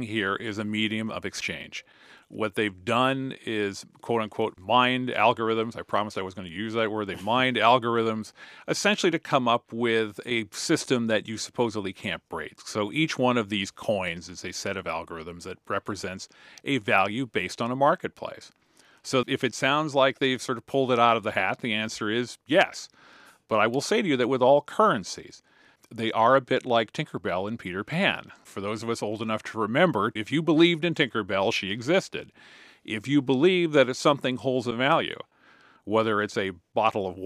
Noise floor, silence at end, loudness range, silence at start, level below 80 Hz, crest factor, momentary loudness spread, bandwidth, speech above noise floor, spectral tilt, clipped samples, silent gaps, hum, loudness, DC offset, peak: -57 dBFS; 0 s; 4 LU; 0 s; -68 dBFS; 20 dB; 14 LU; 15 kHz; 31 dB; -4.5 dB/octave; under 0.1%; none; none; -26 LUFS; under 0.1%; -6 dBFS